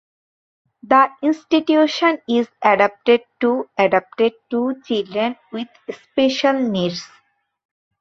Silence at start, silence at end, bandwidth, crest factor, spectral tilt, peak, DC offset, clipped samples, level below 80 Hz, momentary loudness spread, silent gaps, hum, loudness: 0.9 s; 0.95 s; 7.6 kHz; 18 dB; -5 dB/octave; -2 dBFS; under 0.1%; under 0.1%; -66 dBFS; 10 LU; none; none; -18 LUFS